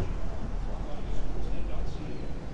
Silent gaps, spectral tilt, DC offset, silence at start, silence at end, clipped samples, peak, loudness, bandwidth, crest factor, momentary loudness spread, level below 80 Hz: none; -7 dB/octave; under 0.1%; 0 s; 0 s; under 0.1%; -16 dBFS; -38 LUFS; 7.6 kHz; 10 dB; 2 LU; -34 dBFS